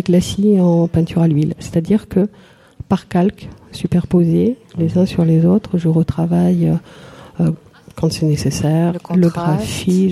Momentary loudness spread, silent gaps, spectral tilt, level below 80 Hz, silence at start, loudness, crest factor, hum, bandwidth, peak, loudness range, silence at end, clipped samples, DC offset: 7 LU; none; -7.5 dB/octave; -42 dBFS; 0.05 s; -16 LUFS; 12 dB; none; 12.5 kHz; -4 dBFS; 3 LU; 0 s; under 0.1%; under 0.1%